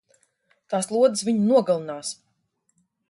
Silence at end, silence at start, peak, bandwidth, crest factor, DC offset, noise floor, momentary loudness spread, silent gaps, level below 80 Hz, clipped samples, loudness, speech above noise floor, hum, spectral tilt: 0.95 s; 0.7 s; -8 dBFS; 11.5 kHz; 18 dB; under 0.1%; -72 dBFS; 13 LU; none; -74 dBFS; under 0.1%; -23 LUFS; 50 dB; none; -5 dB/octave